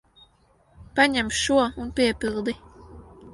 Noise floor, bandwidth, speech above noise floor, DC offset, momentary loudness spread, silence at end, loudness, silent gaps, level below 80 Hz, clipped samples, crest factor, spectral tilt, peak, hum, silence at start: -61 dBFS; 11.5 kHz; 38 dB; under 0.1%; 10 LU; 0 s; -23 LUFS; none; -48 dBFS; under 0.1%; 20 dB; -3 dB/octave; -4 dBFS; none; 0.8 s